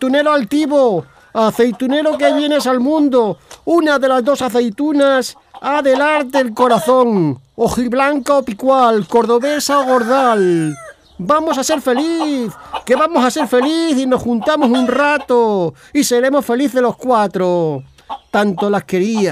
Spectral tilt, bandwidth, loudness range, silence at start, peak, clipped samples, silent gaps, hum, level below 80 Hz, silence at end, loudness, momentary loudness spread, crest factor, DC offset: -5 dB/octave; 16 kHz; 2 LU; 0 s; 0 dBFS; under 0.1%; none; none; -52 dBFS; 0 s; -14 LUFS; 7 LU; 14 dB; under 0.1%